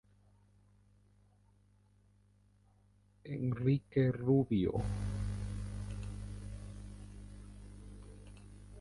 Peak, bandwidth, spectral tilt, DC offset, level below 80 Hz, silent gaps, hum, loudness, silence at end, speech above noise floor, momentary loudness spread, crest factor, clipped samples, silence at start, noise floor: -18 dBFS; 11.5 kHz; -8.5 dB/octave; under 0.1%; -50 dBFS; none; 50 Hz at -50 dBFS; -36 LUFS; 0 s; 35 dB; 23 LU; 20 dB; under 0.1%; 3.25 s; -68 dBFS